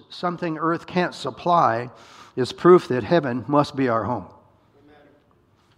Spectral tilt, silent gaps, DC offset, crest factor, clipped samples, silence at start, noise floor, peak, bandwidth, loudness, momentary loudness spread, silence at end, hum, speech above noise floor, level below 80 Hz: -7 dB/octave; none; under 0.1%; 20 dB; under 0.1%; 0.1 s; -60 dBFS; -4 dBFS; 10 kHz; -21 LUFS; 13 LU; 1.5 s; none; 39 dB; -62 dBFS